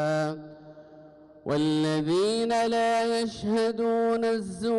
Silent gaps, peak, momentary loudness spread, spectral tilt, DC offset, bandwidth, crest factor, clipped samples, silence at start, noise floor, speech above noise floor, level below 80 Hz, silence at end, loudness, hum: none; -20 dBFS; 7 LU; -5.5 dB/octave; under 0.1%; 11.5 kHz; 8 dB; under 0.1%; 0 s; -51 dBFS; 25 dB; -62 dBFS; 0 s; -26 LUFS; none